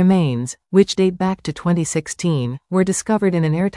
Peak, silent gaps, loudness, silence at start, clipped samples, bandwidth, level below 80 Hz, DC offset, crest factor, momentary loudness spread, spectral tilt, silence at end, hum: -2 dBFS; none; -19 LUFS; 0 s; under 0.1%; 12 kHz; -52 dBFS; under 0.1%; 16 dB; 6 LU; -6 dB/octave; 0 s; none